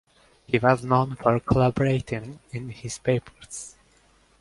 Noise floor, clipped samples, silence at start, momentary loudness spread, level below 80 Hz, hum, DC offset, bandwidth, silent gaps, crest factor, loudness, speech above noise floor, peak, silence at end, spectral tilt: -60 dBFS; under 0.1%; 0.5 s; 16 LU; -48 dBFS; none; under 0.1%; 11.5 kHz; none; 22 dB; -24 LUFS; 36 dB; -4 dBFS; 0.7 s; -6.5 dB/octave